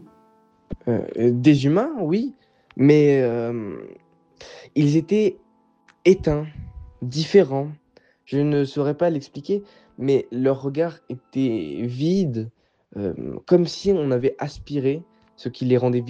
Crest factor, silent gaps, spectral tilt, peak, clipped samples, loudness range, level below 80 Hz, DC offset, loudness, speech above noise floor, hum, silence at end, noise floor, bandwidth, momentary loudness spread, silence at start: 18 dB; none; -7.5 dB/octave; -4 dBFS; under 0.1%; 4 LU; -50 dBFS; under 0.1%; -22 LUFS; 38 dB; none; 0 s; -59 dBFS; 8.4 kHz; 16 LU; 0.7 s